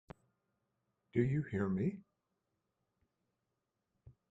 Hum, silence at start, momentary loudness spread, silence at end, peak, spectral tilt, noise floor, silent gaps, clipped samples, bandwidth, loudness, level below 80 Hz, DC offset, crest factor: none; 1.15 s; 5 LU; 0.2 s; -20 dBFS; -10 dB/octave; -87 dBFS; none; under 0.1%; 7.8 kHz; -37 LUFS; -68 dBFS; under 0.1%; 22 dB